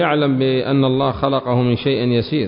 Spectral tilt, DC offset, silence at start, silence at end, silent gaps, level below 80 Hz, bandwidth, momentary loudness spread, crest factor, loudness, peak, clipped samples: -12 dB/octave; under 0.1%; 0 s; 0 s; none; -44 dBFS; 5.4 kHz; 2 LU; 14 dB; -17 LUFS; -2 dBFS; under 0.1%